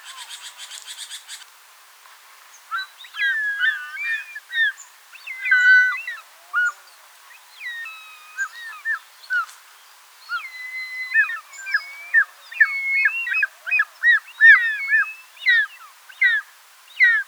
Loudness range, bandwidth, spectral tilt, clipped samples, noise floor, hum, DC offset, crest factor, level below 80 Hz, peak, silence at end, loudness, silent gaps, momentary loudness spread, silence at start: 13 LU; over 20 kHz; 8 dB/octave; under 0.1%; -49 dBFS; none; under 0.1%; 22 dB; under -90 dBFS; -2 dBFS; 0.05 s; -19 LUFS; none; 20 LU; 0.05 s